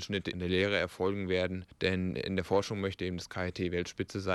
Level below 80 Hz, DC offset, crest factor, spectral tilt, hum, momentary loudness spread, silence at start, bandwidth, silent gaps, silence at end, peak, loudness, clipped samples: -58 dBFS; under 0.1%; 18 dB; -5.5 dB/octave; none; 6 LU; 0 s; 12.5 kHz; none; 0 s; -14 dBFS; -33 LUFS; under 0.1%